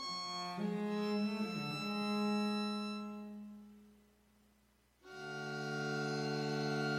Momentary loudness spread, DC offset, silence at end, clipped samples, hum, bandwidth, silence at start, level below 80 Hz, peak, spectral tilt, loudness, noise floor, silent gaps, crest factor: 14 LU; under 0.1%; 0 s; under 0.1%; 60 Hz at -75 dBFS; 14 kHz; 0 s; -76 dBFS; -26 dBFS; -5.5 dB/octave; -39 LUFS; -72 dBFS; none; 14 dB